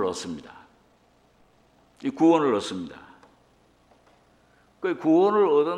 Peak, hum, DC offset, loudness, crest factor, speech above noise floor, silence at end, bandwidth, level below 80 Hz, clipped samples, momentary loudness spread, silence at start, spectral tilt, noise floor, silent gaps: -8 dBFS; none; under 0.1%; -23 LUFS; 18 dB; 39 dB; 0 s; 10 kHz; -68 dBFS; under 0.1%; 17 LU; 0 s; -5.5 dB/octave; -61 dBFS; none